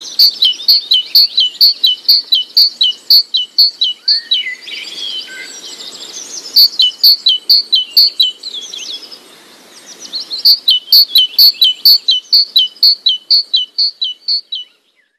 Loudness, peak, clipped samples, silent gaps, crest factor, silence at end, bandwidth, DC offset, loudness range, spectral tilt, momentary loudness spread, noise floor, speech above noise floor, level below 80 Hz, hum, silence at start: -8 LUFS; 0 dBFS; under 0.1%; none; 12 dB; 0.55 s; 15.5 kHz; under 0.1%; 5 LU; 3 dB/octave; 18 LU; -29 dBFS; 16 dB; -72 dBFS; none; 0 s